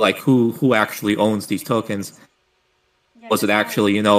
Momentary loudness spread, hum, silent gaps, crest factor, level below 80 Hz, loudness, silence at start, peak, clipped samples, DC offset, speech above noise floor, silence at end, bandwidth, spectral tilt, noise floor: 8 LU; none; none; 18 dB; -62 dBFS; -19 LUFS; 0 s; -2 dBFS; under 0.1%; under 0.1%; 47 dB; 0 s; 15.5 kHz; -5 dB/octave; -65 dBFS